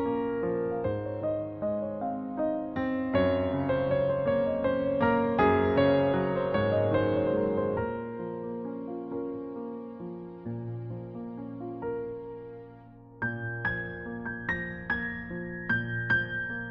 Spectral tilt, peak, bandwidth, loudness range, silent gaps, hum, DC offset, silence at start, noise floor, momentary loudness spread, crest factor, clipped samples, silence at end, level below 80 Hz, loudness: -5.5 dB/octave; -12 dBFS; 5.4 kHz; 12 LU; none; none; under 0.1%; 0 s; -50 dBFS; 14 LU; 18 dB; under 0.1%; 0 s; -54 dBFS; -30 LUFS